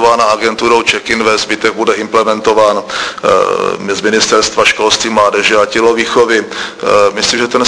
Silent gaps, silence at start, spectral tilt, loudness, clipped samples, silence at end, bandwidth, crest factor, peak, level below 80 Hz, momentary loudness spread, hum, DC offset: none; 0 s; -2.5 dB/octave; -10 LUFS; 0.4%; 0 s; 11 kHz; 10 dB; 0 dBFS; -46 dBFS; 5 LU; none; under 0.1%